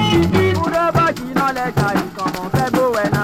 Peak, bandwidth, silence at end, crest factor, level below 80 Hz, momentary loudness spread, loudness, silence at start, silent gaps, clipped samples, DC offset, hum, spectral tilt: -2 dBFS; 17 kHz; 0 s; 14 dB; -40 dBFS; 5 LU; -17 LUFS; 0 s; none; under 0.1%; under 0.1%; none; -6 dB/octave